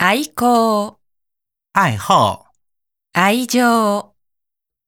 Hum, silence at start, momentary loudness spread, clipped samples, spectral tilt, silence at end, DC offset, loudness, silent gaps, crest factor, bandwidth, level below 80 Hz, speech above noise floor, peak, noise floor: none; 0 s; 9 LU; under 0.1%; -4.5 dB/octave; 0.85 s; under 0.1%; -16 LUFS; none; 18 dB; 19.5 kHz; -58 dBFS; 67 dB; 0 dBFS; -82 dBFS